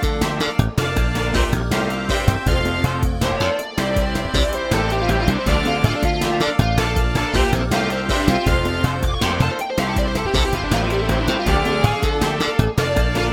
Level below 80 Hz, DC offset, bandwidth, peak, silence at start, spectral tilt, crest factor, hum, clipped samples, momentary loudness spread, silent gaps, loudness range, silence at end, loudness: -24 dBFS; under 0.1%; 18.5 kHz; 0 dBFS; 0 s; -5.5 dB/octave; 18 dB; none; under 0.1%; 2 LU; none; 1 LU; 0 s; -19 LUFS